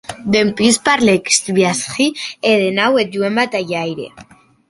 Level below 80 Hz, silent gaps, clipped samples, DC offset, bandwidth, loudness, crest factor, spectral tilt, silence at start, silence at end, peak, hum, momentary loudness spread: -54 dBFS; none; under 0.1%; under 0.1%; 11.5 kHz; -15 LUFS; 16 dB; -3.5 dB/octave; 0.1 s; 0.45 s; 0 dBFS; none; 9 LU